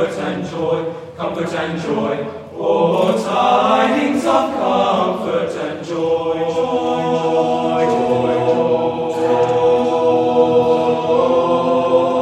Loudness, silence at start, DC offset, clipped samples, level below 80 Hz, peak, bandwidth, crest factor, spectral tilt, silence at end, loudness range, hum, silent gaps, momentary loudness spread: -16 LUFS; 0 s; under 0.1%; under 0.1%; -58 dBFS; -2 dBFS; 10.5 kHz; 14 dB; -6 dB/octave; 0 s; 3 LU; none; none; 8 LU